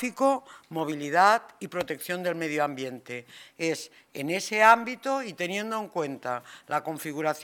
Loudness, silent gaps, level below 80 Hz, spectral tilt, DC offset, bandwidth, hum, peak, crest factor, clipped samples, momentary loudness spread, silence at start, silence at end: -27 LUFS; none; -76 dBFS; -4 dB/octave; under 0.1%; 18 kHz; none; -6 dBFS; 22 dB; under 0.1%; 15 LU; 0 s; 0 s